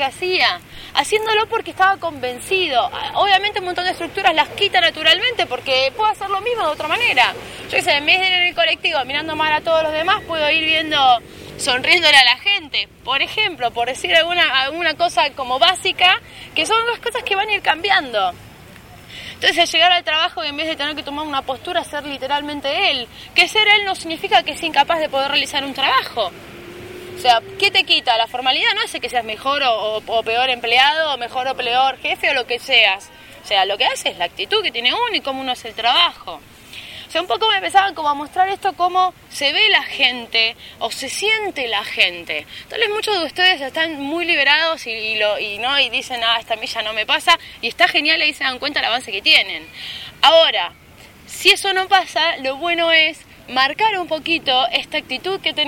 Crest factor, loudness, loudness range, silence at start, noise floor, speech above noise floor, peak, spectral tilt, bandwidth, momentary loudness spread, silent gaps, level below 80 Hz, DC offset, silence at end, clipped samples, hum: 18 dB; -16 LUFS; 4 LU; 0 s; -43 dBFS; 25 dB; 0 dBFS; -1.5 dB/octave; 17 kHz; 10 LU; none; -52 dBFS; under 0.1%; 0 s; under 0.1%; none